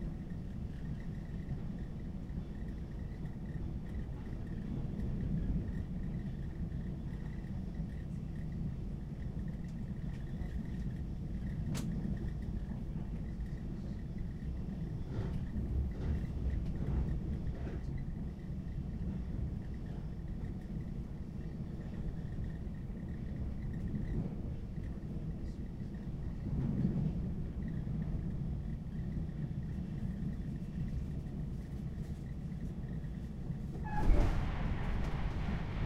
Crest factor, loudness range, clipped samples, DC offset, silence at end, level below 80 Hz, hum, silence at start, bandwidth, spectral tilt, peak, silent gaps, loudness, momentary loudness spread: 22 dB; 4 LU; under 0.1%; under 0.1%; 0 s; -42 dBFS; none; 0 s; 11.5 kHz; -8.5 dB/octave; -16 dBFS; none; -41 LUFS; 6 LU